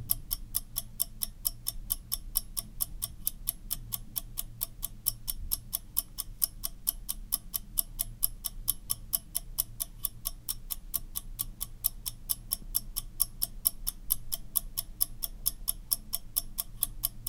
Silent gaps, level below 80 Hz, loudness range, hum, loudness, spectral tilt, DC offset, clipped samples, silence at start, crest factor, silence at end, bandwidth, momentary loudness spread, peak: none; -44 dBFS; 3 LU; none; -33 LUFS; -1 dB/octave; under 0.1%; under 0.1%; 0 s; 30 dB; 0 s; 19 kHz; 6 LU; -6 dBFS